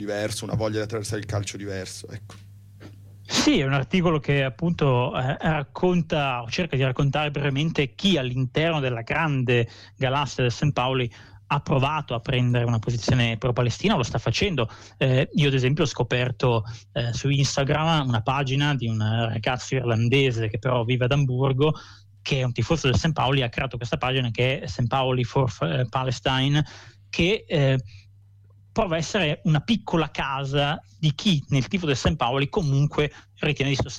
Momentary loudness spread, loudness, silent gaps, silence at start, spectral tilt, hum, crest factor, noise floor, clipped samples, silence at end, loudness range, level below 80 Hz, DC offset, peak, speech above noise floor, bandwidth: 6 LU; -24 LUFS; none; 0 s; -5.5 dB/octave; none; 12 dB; -52 dBFS; under 0.1%; 0 s; 2 LU; -44 dBFS; under 0.1%; -10 dBFS; 29 dB; 11.5 kHz